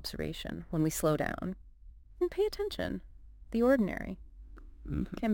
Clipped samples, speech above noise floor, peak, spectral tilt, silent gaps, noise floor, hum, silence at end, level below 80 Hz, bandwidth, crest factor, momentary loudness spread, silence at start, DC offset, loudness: under 0.1%; 21 dB; -16 dBFS; -5.5 dB/octave; none; -53 dBFS; none; 0 s; -48 dBFS; 17 kHz; 18 dB; 16 LU; 0 s; under 0.1%; -33 LUFS